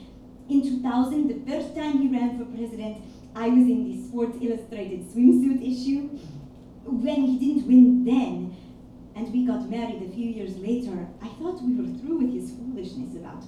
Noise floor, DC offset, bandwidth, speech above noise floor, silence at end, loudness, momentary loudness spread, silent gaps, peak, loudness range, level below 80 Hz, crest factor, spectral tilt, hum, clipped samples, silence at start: -45 dBFS; under 0.1%; 11 kHz; 21 dB; 0 s; -24 LUFS; 18 LU; none; -6 dBFS; 8 LU; -54 dBFS; 18 dB; -7 dB/octave; none; under 0.1%; 0 s